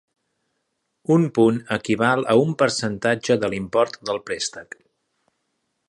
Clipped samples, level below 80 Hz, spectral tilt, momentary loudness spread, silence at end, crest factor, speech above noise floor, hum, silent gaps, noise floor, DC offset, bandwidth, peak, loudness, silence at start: under 0.1%; -60 dBFS; -5.5 dB/octave; 11 LU; 1.25 s; 20 dB; 54 dB; none; none; -75 dBFS; under 0.1%; 11.5 kHz; -4 dBFS; -21 LUFS; 1.1 s